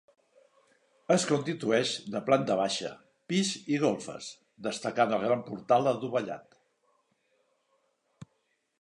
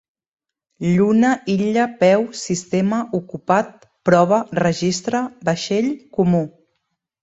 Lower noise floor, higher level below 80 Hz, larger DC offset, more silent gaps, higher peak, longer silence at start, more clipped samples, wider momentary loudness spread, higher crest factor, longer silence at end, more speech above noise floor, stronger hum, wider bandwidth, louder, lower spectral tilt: about the same, -76 dBFS vs -74 dBFS; second, -76 dBFS vs -56 dBFS; neither; neither; second, -10 dBFS vs 0 dBFS; first, 1.1 s vs 0.8 s; neither; first, 14 LU vs 9 LU; about the same, 22 dB vs 18 dB; second, 0.55 s vs 0.75 s; second, 47 dB vs 56 dB; neither; first, 11 kHz vs 8 kHz; second, -29 LUFS vs -19 LUFS; second, -4.5 dB/octave vs -6 dB/octave